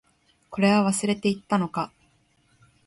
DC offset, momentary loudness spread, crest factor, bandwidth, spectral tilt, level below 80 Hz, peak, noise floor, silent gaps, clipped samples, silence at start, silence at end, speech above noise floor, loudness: under 0.1%; 13 LU; 16 dB; 11.5 kHz; -5 dB/octave; -64 dBFS; -10 dBFS; -64 dBFS; none; under 0.1%; 0.5 s; 1 s; 41 dB; -24 LUFS